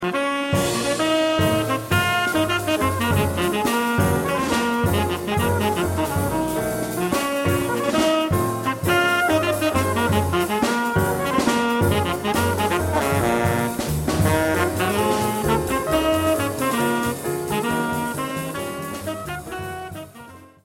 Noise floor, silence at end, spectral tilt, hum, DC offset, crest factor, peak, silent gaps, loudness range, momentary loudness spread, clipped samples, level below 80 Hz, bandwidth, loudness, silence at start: -43 dBFS; 0.2 s; -5 dB/octave; none; under 0.1%; 16 dB; -6 dBFS; none; 3 LU; 7 LU; under 0.1%; -40 dBFS; 16.5 kHz; -21 LUFS; 0 s